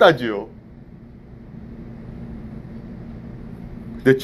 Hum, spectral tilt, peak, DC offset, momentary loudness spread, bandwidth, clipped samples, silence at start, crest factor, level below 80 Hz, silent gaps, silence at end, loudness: none; -6.5 dB/octave; 0 dBFS; under 0.1%; 22 LU; 13 kHz; under 0.1%; 0 s; 22 dB; -44 dBFS; none; 0 s; -26 LUFS